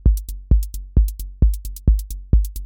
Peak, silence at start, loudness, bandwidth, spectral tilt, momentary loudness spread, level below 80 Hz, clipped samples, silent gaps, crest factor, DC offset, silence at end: -4 dBFS; 0.05 s; -22 LUFS; 17 kHz; -8 dB/octave; 3 LU; -18 dBFS; under 0.1%; none; 14 dB; under 0.1%; 0 s